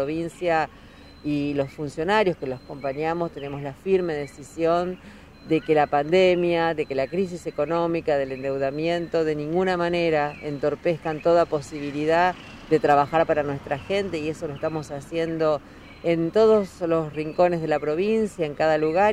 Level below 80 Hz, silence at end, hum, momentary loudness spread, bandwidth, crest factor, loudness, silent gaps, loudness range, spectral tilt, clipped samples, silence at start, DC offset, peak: -52 dBFS; 0 s; none; 11 LU; 12 kHz; 18 dB; -24 LUFS; none; 4 LU; -6.5 dB/octave; under 0.1%; 0 s; under 0.1%; -6 dBFS